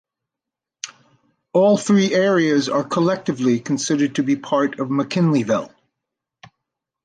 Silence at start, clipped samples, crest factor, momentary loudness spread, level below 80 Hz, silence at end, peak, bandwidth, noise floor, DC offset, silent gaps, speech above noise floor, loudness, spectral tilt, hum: 0.85 s; under 0.1%; 16 dB; 10 LU; -66 dBFS; 1.4 s; -4 dBFS; 9.8 kHz; -86 dBFS; under 0.1%; none; 68 dB; -19 LUFS; -5.5 dB/octave; none